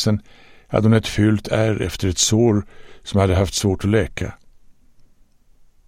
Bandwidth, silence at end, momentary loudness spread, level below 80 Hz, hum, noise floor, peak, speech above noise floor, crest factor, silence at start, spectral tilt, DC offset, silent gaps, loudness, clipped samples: 15.5 kHz; 1.15 s; 9 LU; -38 dBFS; none; -52 dBFS; -4 dBFS; 33 dB; 16 dB; 0 s; -5 dB/octave; under 0.1%; none; -19 LUFS; under 0.1%